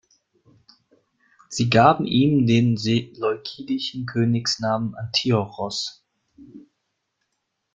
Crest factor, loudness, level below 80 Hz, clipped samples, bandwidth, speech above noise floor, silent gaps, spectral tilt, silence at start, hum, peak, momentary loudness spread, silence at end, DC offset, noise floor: 22 dB; -21 LUFS; -58 dBFS; under 0.1%; 7.8 kHz; 56 dB; none; -5.5 dB/octave; 1.5 s; none; -2 dBFS; 12 LU; 1.15 s; under 0.1%; -77 dBFS